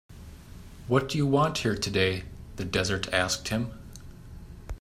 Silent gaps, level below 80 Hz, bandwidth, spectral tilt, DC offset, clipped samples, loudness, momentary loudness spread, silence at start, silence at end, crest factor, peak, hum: none; -46 dBFS; 16 kHz; -4.5 dB/octave; under 0.1%; under 0.1%; -27 LUFS; 23 LU; 0.1 s; 0.05 s; 22 dB; -8 dBFS; none